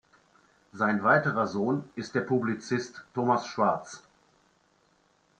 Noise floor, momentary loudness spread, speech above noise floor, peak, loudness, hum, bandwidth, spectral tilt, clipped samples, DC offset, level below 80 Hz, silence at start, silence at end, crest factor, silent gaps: -67 dBFS; 11 LU; 39 dB; -8 dBFS; -28 LUFS; none; 9.4 kHz; -6 dB/octave; under 0.1%; under 0.1%; -72 dBFS; 0.75 s; 1.4 s; 22 dB; none